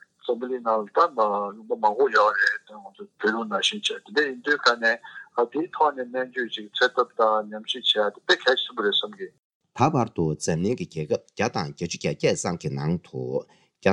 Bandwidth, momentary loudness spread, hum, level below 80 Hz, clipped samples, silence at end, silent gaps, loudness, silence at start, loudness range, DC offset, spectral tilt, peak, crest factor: 11.5 kHz; 10 LU; none; -64 dBFS; under 0.1%; 0 s; 9.39-9.60 s; -24 LUFS; 0.25 s; 4 LU; under 0.1%; -4 dB/octave; -4 dBFS; 22 dB